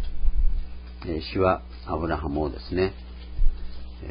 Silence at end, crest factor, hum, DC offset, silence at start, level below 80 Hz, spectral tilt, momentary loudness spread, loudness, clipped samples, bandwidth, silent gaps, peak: 0 s; 18 dB; none; under 0.1%; 0 s; -30 dBFS; -11 dB/octave; 16 LU; -28 LUFS; under 0.1%; 5.2 kHz; none; -6 dBFS